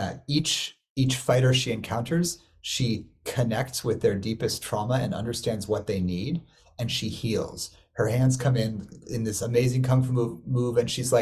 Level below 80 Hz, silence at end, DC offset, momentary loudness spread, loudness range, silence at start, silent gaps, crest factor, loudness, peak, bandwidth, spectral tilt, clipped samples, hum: -50 dBFS; 0 s; under 0.1%; 9 LU; 3 LU; 0 s; 0.90-0.96 s; 18 dB; -27 LUFS; -8 dBFS; 14.5 kHz; -5 dB/octave; under 0.1%; none